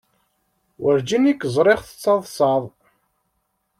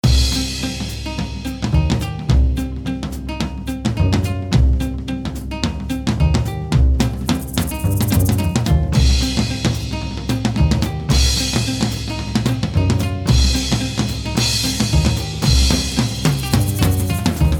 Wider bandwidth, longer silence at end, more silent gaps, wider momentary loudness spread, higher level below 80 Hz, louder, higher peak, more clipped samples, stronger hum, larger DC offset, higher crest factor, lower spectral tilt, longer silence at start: second, 15.5 kHz vs 19 kHz; first, 1.1 s vs 0 s; neither; about the same, 7 LU vs 9 LU; second, -58 dBFS vs -22 dBFS; about the same, -19 LUFS vs -18 LUFS; second, -4 dBFS vs 0 dBFS; neither; neither; neither; about the same, 18 dB vs 16 dB; about the same, -5.5 dB/octave vs -5 dB/octave; first, 0.8 s vs 0.05 s